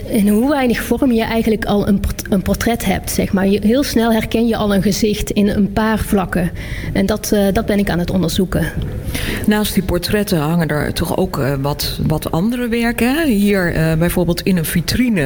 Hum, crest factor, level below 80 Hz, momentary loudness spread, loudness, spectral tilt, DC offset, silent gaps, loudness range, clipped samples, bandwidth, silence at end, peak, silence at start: none; 12 dB; -30 dBFS; 4 LU; -16 LUFS; -5.5 dB/octave; under 0.1%; none; 2 LU; under 0.1%; 19.5 kHz; 0 s; -4 dBFS; 0 s